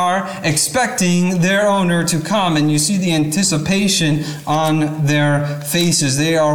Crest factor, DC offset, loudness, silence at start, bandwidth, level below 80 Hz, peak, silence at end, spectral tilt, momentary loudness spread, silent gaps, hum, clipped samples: 12 dB; 0.5%; -16 LUFS; 0 s; 18.5 kHz; -48 dBFS; -4 dBFS; 0 s; -4 dB/octave; 4 LU; none; none; under 0.1%